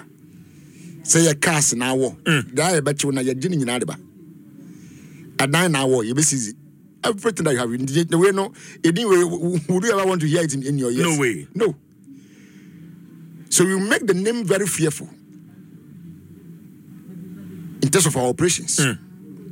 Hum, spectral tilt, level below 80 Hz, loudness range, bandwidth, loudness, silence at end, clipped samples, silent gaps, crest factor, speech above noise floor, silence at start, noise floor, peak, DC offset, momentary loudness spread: none; -4 dB/octave; -62 dBFS; 5 LU; 17 kHz; -19 LUFS; 0 s; under 0.1%; none; 18 dB; 26 dB; 0 s; -46 dBFS; -2 dBFS; under 0.1%; 14 LU